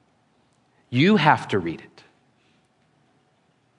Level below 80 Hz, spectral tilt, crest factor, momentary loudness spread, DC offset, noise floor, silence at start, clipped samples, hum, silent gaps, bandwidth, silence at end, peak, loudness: -68 dBFS; -6.5 dB/octave; 24 dB; 16 LU; under 0.1%; -65 dBFS; 0.9 s; under 0.1%; none; none; 10.5 kHz; 2 s; -2 dBFS; -20 LUFS